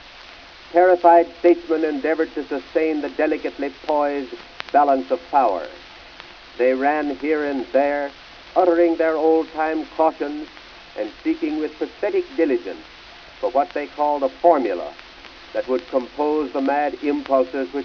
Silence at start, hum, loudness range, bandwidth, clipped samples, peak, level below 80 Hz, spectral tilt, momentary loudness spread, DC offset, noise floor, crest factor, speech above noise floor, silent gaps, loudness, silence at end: 0.05 s; none; 5 LU; 5.4 kHz; under 0.1%; -2 dBFS; -56 dBFS; -5.5 dB/octave; 21 LU; under 0.1%; -42 dBFS; 18 dB; 22 dB; none; -21 LUFS; 0 s